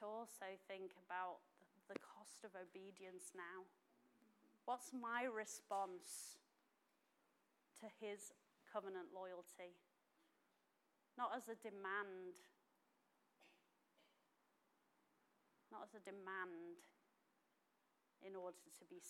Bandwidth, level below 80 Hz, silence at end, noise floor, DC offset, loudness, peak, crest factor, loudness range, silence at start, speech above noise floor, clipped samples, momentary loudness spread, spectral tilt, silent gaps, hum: 16 kHz; under -90 dBFS; 0 s; -84 dBFS; under 0.1%; -53 LUFS; -32 dBFS; 22 dB; 8 LU; 0 s; 32 dB; under 0.1%; 14 LU; -2.5 dB/octave; none; none